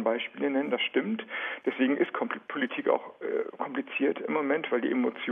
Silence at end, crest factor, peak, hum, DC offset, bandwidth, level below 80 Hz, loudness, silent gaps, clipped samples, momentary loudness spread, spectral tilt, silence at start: 0 s; 18 dB; -12 dBFS; none; under 0.1%; 3.8 kHz; -88 dBFS; -30 LUFS; none; under 0.1%; 6 LU; -7.5 dB/octave; 0 s